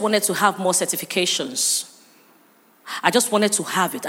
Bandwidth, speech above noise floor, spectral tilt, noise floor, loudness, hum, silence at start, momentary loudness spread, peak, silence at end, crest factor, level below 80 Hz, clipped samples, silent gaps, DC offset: 17 kHz; 34 dB; -2 dB/octave; -55 dBFS; -20 LUFS; none; 0 s; 5 LU; -2 dBFS; 0 s; 20 dB; -80 dBFS; under 0.1%; none; under 0.1%